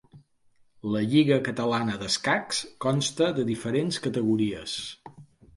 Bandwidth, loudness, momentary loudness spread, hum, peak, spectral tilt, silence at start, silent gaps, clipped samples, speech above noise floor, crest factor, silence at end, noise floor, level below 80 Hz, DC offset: 11.5 kHz; -26 LUFS; 10 LU; none; -8 dBFS; -5 dB/octave; 0.15 s; none; under 0.1%; 36 dB; 18 dB; 0.35 s; -62 dBFS; -60 dBFS; under 0.1%